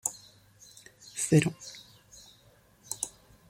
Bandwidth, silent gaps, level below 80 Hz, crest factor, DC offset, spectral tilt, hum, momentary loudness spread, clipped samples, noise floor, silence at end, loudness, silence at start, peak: 16.5 kHz; none; -66 dBFS; 26 dB; under 0.1%; -5 dB/octave; none; 27 LU; under 0.1%; -61 dBFS; 0.4 s; -30 LUFS; 0.05 s; -8 dBFS